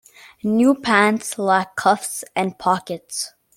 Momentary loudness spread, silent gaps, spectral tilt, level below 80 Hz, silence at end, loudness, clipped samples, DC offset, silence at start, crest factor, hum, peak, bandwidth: 12 LU; none; -4 dB/octave; -62 dBFS; 0.3 s; -20 LUFS; under 0.1%; under 0.1%; 0.45 s; 18 dB; none; -2 dBFS; 16.5 kHz